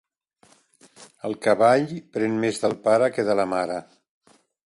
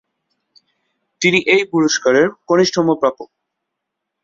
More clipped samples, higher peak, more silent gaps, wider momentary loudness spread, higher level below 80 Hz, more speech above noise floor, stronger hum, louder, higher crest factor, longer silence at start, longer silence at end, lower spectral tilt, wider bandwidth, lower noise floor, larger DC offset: neither; second, -6 dBFS vs -2 dBFS; neither; first, 12 LU vs 5 LU; second, -68 dBFS vs -60 dBFS; second, 38 dB vs 64 dB; neither; second, -22 LUFS vs -15 LUFS; about the same, 18 dB vs 16 dB; second, 1 s vs 1.2 s; second, 0.85 s vs 1 s; first, -5.5 dB/octave vs -4 dB/octave; first, 11.5 kHz vs 7.8 kHz; second, -60 dBFS vs -78 dBFS; neither